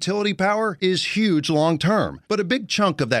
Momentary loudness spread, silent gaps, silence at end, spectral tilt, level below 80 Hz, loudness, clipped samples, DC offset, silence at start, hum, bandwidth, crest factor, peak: 3 LU; none; 0 s; -5 dB/octave; -56 dBFS; -21 LUFS; under 0.1%; under 0.1%; 0 s; none; 13 kHz; 16 dB; -4 dBFS